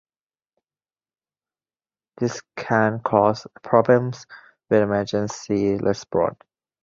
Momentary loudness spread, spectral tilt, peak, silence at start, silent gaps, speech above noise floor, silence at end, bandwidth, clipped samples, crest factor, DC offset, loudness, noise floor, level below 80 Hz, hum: 8 LU; -6.5 dB/octave; -2 dBFS; 2.2 s; none; over 69 dB; 0.5 s; 7.6 kHz; under 0.1%; 22 dB; under 0.1%; -22 LUFS; under -90 dBFS; -56 dBFS; none